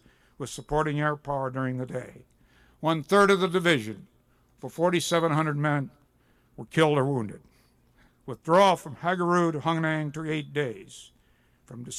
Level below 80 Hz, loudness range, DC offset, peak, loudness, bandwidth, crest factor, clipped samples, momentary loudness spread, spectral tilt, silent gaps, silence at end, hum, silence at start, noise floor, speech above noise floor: -58 dBFS; 4 LU; under 0.1%; -10 dBFS; -26 LUFS; 15.5 kHz; 18 dB; under 0.1%; 21 LU; -5.5 dB/octave; none; 0 s; none; 0.4 s; -64 dBFS; 38 dB